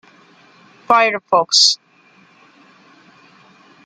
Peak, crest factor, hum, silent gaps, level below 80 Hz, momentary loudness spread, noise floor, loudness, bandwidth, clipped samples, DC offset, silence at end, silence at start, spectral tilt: 0 dBFS; 20 dB; none; none; -74 dBFS; 6 LU; -51 dBFS; -13 LUFS; 12 kHz; under 0.1%; under 0.1%; 2.1 s; 0.9 s; 0 dB/octave